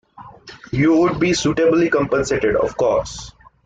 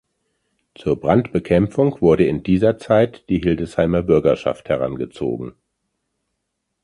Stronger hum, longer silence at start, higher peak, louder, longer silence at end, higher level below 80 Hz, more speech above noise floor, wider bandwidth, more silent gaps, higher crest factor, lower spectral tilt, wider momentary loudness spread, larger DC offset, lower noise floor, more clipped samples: neither; second, 0.2 s vs 0.8 s; second, -6 dBFS vs -2 dBFS; about the same, -17 LUFS vs -18 LUFS; second, 0.35 s vs 1.35 s; about the same, -42 dBFS vs -42 dBFS; second, 24 dB vs 58 dB; second, 9.2 kHz vs 11 kHz; neither; second, 12 dB vs 18 dB; second, -5.5 dB/octave vs -8.5 dB/octave; about the same, 8 LU vs 9 LU; neither; second, -41 dBFS vs -76 dBFS; neither